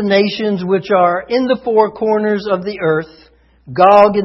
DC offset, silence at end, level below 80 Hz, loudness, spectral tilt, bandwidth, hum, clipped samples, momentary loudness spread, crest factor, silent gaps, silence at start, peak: under 0.1%; 0 s; -52 dBFS; -14 LUFS; -7.5 dB/octave; 6 kHz; none; under 0.1%; 10 LU; 14 dB; none; 0 s; 0 dBFS